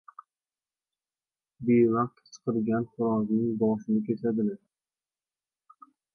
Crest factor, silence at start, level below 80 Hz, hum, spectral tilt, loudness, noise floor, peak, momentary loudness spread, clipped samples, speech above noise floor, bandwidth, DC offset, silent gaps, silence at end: 18 dB; 1.6 s; -68 dBFS; none; -9 dB/octave; -28 LUFS; under -90 dBFS; -12 dBFS; 10 LU; under 0.1%; over 64 dB; 6.6 kHz; under 0.1%; none; 1.6 s